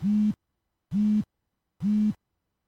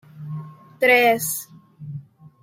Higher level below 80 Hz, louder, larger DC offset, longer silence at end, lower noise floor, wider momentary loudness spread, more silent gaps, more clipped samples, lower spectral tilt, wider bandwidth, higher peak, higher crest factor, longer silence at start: first, -60 dBFS vs -68 dBFS; second, -27 LUFS vs -18 LUFS; neither; first, 0.55 s vs 0.4 s; first, -81 dBFS vs -39 dBFS; second, 15 LU vs 22 LU; neither; neither; first, -9 dB/octave vs -3.5 dB/octave; second, 6.2 kHz vs 16.5 kHz; second, -18 dBFS vs -4 dBFS; second, 10 dB vs 18 dB; second, 0 s vs 0.15 s